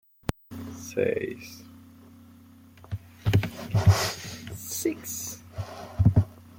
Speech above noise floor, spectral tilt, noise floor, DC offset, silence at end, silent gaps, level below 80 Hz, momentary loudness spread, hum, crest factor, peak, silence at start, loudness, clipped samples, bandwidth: 21 dB; -5.5 dB/octave; -52 dBFS; under 0.1%; 0 s; none; -46 dBFS; 17 LU; none; 22 dB; -6 dBFS; 0.3 s; -28 LUFS; under 0.1%; 17 kHz